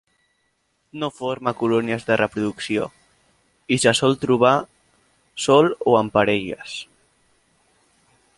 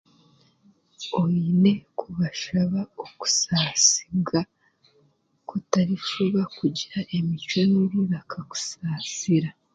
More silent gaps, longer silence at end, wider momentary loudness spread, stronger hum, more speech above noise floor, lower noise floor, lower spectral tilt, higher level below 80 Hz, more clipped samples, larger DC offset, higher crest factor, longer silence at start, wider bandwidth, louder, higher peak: neither; first, 1.55 s vs 0.25 s; first, 16 LU vs 11 LU; neither; first, 49 dB vs 41 dB; first, -69 dBFS vs -65 dBFS; about the same, -4.5 dB/octave vs -4 dB/octave; about the same, -58 dBFS vs -60 dBFS; neither; neither; about the same, 20 dB vs 22 dB; about the same, 0.95 s vs 1 s; first, 11.5 kHz vs 9.2 kHz; first, -20 LUFS vs -24 LUFS; about the same, -2 dBFS vs -4 dBFS